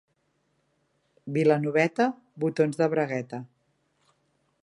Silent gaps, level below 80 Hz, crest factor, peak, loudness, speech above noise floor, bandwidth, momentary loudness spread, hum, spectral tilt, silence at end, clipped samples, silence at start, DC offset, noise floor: none; -78 dBFS; 20 dB; -8 dBFS; -26 LUFS; 48 dB; 11 kHz; 13 LU; none; -7 dB/octave; 1.2 s; under 0.1%; 1.25 s; under 0.1%; -73 dBFS